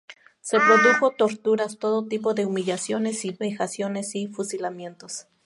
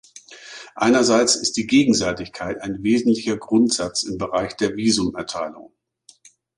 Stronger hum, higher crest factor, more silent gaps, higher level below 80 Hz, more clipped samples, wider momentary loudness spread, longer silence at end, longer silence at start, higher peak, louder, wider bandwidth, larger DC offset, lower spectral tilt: neither; about the same, 20 dB vs 18 dB; neither; second, -76 dBFS vs -52 dBFS; neither; first, 16 LU vs 13 LU; second, 0.25 s vs 0.95 s; about the same, 0.1 s vs 0.15 s; about the same, -4 dBFS vs -4 dBFS; second, -23 LUFS vs -20 LUFS; about the same, 11.5 kHz vs 11.5 kHz; neither; about the same, -4 dB/octave vs -3.5 dB/octave